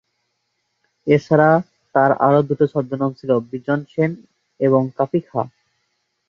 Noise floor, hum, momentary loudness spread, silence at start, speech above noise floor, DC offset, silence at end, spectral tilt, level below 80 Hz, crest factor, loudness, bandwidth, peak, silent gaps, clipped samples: -72 dBFS; none; 10 LU; 1.05 s; 55 dB; under 0.1%; 0.8 s; -9 dB/octave; -62 dBFS; 18 dB; -18 LUFS; 7 kHz; 0 dBFS; none; under 0.1%